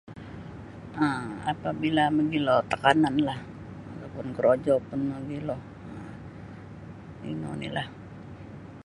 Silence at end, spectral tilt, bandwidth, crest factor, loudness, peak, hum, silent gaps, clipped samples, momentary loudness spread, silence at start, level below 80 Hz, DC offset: 0 s; -6.5 dB/octave; 11 kHz; 24 dB; -27 LUFS; -4 dBFS; none; none; under 0.1%; 21 LU; 0.05 s; -56 dBFS; under 0.1%